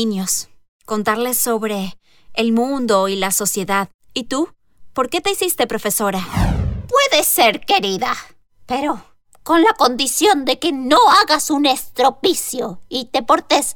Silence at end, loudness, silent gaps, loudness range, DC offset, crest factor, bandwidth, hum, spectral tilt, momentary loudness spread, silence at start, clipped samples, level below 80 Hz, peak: 0 s; -17 LUFS; 0.68-0.80 s, 3.94-3.99 s; 5 LU; under 0.1%; 14 dB; over 20 kHz; none; -3 dB/octave; 13 LU; 0 s; under 0.1%; -36 dBFS; -4 dBFS